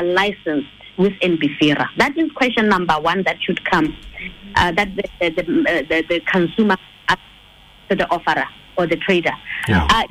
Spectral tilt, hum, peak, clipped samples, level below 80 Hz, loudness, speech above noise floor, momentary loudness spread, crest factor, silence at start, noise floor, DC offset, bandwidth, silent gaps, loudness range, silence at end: -5.5 dB/octave; none; -4 dBFS; under 0.1%; -38 dBFS; -18 LUFS; 28 dB; 7 LU; 14 dB; 0 s; -46 dBFS; under 0.1%; 15.5 kHz; none; 2 LU; 0.05 s